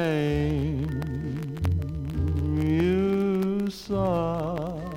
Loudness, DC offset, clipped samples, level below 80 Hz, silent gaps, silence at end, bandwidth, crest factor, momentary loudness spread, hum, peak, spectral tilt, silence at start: -27 LUFS; under 0.1%; under 0.1%; -40 dBFS; none; 0 s; 16.5 kHz; 14 dB; 8 LU; none; -12 dBFS; -8 dB/octave; 0 s